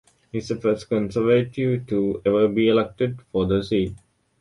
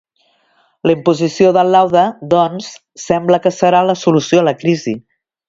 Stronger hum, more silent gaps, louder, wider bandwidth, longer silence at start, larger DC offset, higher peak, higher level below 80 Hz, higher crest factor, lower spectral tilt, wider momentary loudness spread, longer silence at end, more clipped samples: neither; neither; second, -22 LUFS vs -13 LUFS; first, 11.5 kHz vs 7.8 kHz; second, 0.35 s vs 0.85 s; neither; second, -6 dBFS vs 0 dBFS; first, -48 dBFS vs -56 dBFS; about the same, 16 dB vs 14 dB; first, -7.5 dB/octave vs -6 dB/octave; second, 8 LU vs 11 LU; about the same, 0.45 s vs 0.5 s; neither